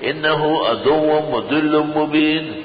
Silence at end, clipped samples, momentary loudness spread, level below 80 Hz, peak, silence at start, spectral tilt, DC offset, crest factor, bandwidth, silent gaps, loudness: 0 s; under 0.1%; 2 LU; -54 dBFS; -6 dBFS; 0 s; -10.5 dB/octave; under 0.1%; 12 dB; 5 kHz; none; -17 LUFS